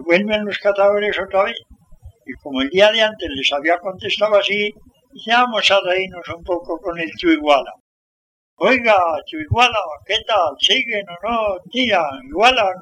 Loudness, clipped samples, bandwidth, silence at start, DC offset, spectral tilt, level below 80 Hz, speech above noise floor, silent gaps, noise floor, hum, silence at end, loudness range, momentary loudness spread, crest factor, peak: -17 LUFS; under 0.1%; 10.5 kHz; 0 s; under 0.1%; -4 dB/octave; -48 dBFS; 26 dB; 7.80-8.57 s; -43 dBFS; none; 0 s; 2 LU; 11 LU; 18 dB; 0 dBFS